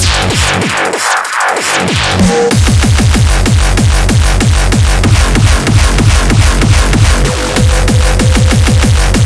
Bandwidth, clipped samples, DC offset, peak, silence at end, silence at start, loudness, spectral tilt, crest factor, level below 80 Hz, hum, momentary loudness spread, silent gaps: 11 kHz; under 0.1%; under 0.1%; 0 dBFS; 0 s; 0 s; -9 LUFS; -4.5 dB/octave; 8 dB; -12 dBFS; none; 2 LU; none